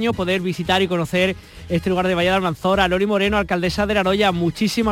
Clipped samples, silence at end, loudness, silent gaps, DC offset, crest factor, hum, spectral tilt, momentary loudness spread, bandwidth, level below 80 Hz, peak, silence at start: under 0.1%; 0 s; -19 LUFS; none; under 0.1%; 14 dB; none; -5.5 dB/octave; 4 LU; 16.5 kHz; -40 dBFS; -4 dBFS; 0 s